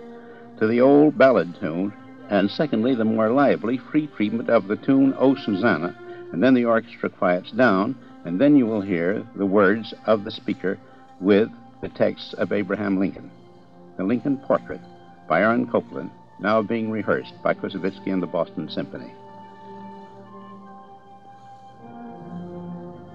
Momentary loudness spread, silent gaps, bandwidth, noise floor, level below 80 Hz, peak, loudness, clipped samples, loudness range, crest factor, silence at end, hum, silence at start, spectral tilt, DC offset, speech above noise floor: 22 LU; none; 6 kHz; -48 dBFS; -64 dBFS; -4 dBFS; -22 LUFS; under 0.1%; 11 LU; 18 dB; 0 s; none; 0 s; -8.5 dB/octave; 0.2%; 27 dB